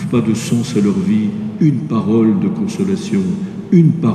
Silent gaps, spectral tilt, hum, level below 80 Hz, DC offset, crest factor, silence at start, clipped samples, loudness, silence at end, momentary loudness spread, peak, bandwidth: none; -7.5 dB/octave; none; -54 dBFS; under 0.1%; 14 dB; 0 s; under 0.1%; -15 LUFS; 0 s; 7 LU; 0 dBFS; 12.5 kHz